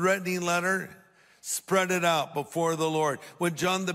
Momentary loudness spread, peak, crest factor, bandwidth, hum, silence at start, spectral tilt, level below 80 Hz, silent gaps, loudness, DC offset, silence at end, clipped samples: 8 LU; -12 dBFS; 16 dB; 16 kHz; none; 0 s; -4 dB/octave; -70 dBFS; none; -27 LUFS; under 0.1%; 0 s; under 0.1%